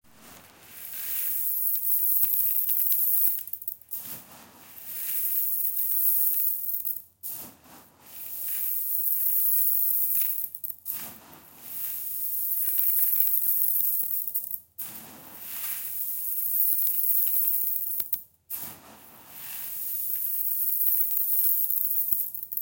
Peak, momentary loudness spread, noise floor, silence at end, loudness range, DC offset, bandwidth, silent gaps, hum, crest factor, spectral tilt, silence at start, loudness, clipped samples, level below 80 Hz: -4 dBFS; 16 LU; -53 dBFS; 0 s; 4 LU; under 0.1%; 18 kHz; none; none; 24 dB; 0 dB/octave; 0.2 s; -23 LUFS; under 0.1%; -76 dBFS